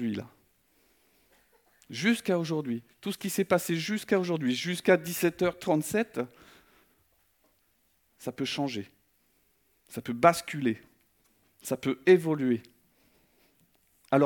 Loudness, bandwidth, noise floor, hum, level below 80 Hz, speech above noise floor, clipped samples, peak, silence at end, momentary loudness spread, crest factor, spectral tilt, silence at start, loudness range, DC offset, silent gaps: -29 LUFS; 18 kHz; -71 dBFS; none; -70 dBFS; 43 dB; under 0.1%; -6 dBFS; 0 s; 16 LU; 24 dB; -5 dB/octave; 0 s; 10 LU; under 0.1%; none